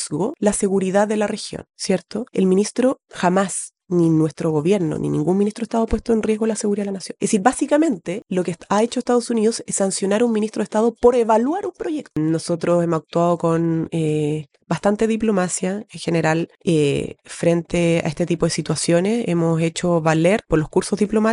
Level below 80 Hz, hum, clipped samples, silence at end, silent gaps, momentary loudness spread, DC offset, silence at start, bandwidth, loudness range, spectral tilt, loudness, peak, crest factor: -44 dBFS; none; under 0.1%; 0 s; none; 6 LU; under 0.1%; 0 s; 11.5 kHz; 2 LU; -5.5 dB/octave; -20 LUFS; -2 dBFS; 18 dB